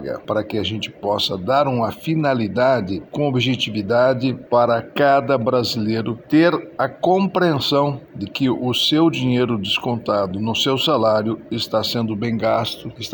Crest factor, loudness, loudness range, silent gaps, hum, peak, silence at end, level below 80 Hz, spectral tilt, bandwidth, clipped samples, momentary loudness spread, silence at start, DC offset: 16 dB; -19 LUFS; 2 LU; none; none; -4 dBFS; 0 s; -56 dBFS; -6 dB/octave; over 20 kHz; under 0.1%; 7 LU; 0 s; under 0.1%